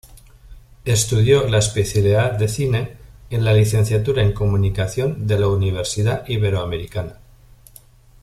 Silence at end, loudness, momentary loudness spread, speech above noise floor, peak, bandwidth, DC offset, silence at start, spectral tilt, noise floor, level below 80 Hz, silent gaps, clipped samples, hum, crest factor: 1.1 s; -19 LUFS; 11 LU; 30 dB; -2 dBFS; 14 kHz; under 0.1%; 0.15 s; -5.5 dB/octave; -47 dBFS; -38 dBFS; none; under 0.1%; none; 16 dB